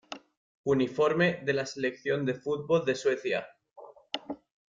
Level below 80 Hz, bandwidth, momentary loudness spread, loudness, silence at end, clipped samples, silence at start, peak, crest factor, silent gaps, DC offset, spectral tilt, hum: -70 dBFS; 7.6 kHz; 14 LU; -29 LUFS; 0.3 s; under 0.1%; 0.1 s; -14 dBFS; 16 dB; 0.37-0.64 s; under 0.1%; -5.5 dB/octave; none